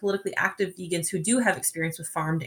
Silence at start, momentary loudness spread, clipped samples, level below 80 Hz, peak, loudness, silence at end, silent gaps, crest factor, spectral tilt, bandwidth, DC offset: 0 s; 7 LU; under 0.1%; -66 dBFS; -10 dBFS; -26 LUFS; 0 s; none; 18 dB; -4 dB/octave; 18 kHz; under 0.1%